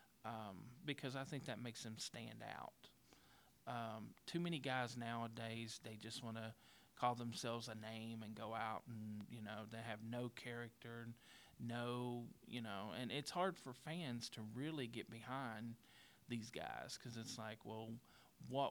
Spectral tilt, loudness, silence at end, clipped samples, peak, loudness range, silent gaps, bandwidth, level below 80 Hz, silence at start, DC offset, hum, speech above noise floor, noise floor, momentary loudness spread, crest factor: -5 dB/octave; -49 LUFS; 0 s; under 0.1%; -26 dBFS; 4 LU; none; over 20 kHz; -84 dBFS; 0 s; under 0.1%; none; 23 dB; -71 dBFS; 11 LU; 22 dB